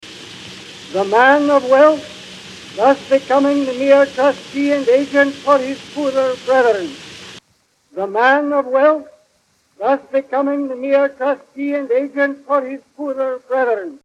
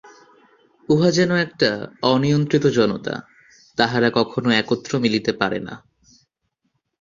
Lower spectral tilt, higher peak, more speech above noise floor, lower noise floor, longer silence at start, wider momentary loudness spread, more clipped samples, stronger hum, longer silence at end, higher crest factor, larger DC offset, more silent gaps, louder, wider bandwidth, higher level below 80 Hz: about the same, -4.5 dB/octave vs -5.5 dB/octave; about the same, 0 dBFS vs -2 dBFS; second, 45 dB vs 54 dB; second, -60 dBFS vs -73 dBFS; about the same, 0.05 s vs 0.05 s; first, 20 LU vs 12 LU; neither; neither; second, 0.1 s vs 1.2 s; about the same, 16 dB vs 20 dB; neither; neither; first, -16 LUFS vs -20 LUFS; first, 10.5 kHz vs 7.4 kHz; second, -64 dBFS vs -56 dBFS